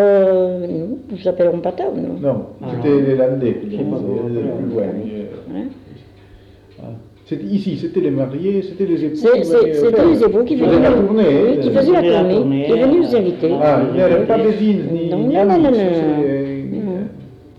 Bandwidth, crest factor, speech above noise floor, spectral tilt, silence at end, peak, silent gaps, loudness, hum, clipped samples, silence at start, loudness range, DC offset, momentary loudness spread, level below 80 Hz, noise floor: 10 kHz; 12 dB; 28 dB; -9 dB/octave; 0.25 s; -4 dBFS; none; -16 LUFS; none; under 0.1%; 0 s; 11 LU; under 0.1%; 13 LU; -46 dBFS; -43 dBFS